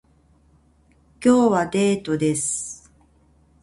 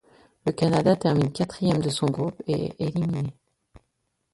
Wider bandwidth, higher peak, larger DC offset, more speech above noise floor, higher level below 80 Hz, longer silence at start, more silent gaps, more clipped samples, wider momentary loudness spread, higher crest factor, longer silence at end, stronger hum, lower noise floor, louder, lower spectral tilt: about the same, 11.5 kHz vs 11.5 kHz; about the same, -6 dBFS vs -8 dBFS; neither; second, 39 dB vs 52 dB; about the same, -56 dBFS vs -56 dBFS; first, 1.2 s vs 0.45 s; neither; neither; first, 12 LU vs 9 LU; about the same, 18 dB vs 18 dB; second, 0.85 s vs 1.05 s; neither; second, -58 dBFS vs -76 dBFS; first, -20 LUFS vs -25 LUFS; second, -5 dB/octave vs -7 dB/octave